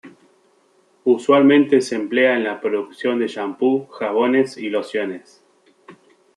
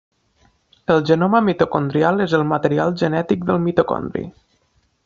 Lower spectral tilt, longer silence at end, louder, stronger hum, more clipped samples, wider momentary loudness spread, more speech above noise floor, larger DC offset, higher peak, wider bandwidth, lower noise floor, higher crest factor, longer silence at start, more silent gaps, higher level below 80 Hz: about the same, -5.5 dB/octave vs -6 dB/octave; second, 0.45 s vs 0.75 s; about the same, -19 LUFS vs -18 LUFS; neither; neither; about the same, 11 LU vs 10 LU; second, 40 dB vs 45 dB; neither; about the same, -2 dBFS vs -2 dBFS; first, 11 kHz vs 7.4 kHz; second, -58 dBFS vs -63 dBFS; about the same, 18 dB vs 18 dB; second, 0.05 s vs 0.9 s; neither; second, -72 dBFS vs -54 dBFS